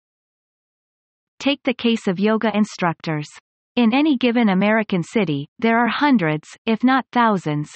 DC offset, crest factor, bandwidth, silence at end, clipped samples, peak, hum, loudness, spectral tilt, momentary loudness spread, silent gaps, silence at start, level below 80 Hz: under 0.1%; 16 dB; 8.6 kHz; 0 s; under 0.1%; -4 dBFS; none; -19 LUFS; -6.5 dB/octave; 8 LU; 3.41-3.75 s, 5.48-5.56 s, 6.58-6.65 s; 1.4 s; -64 dBFS